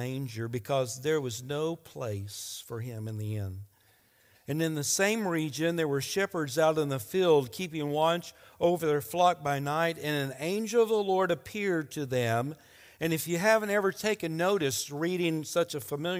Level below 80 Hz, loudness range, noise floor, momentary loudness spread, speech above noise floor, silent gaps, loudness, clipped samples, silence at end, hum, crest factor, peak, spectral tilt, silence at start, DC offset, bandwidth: -70 dBFS; 6 LU; -65 dBFS; 11 LU; 35 dB; none; -30 LUFS; under 0.1%; 0 s; none; 18 dB; -10 dBFS; -4.5 dB/octave; 0 s; under 0.1%; 16.5 kHz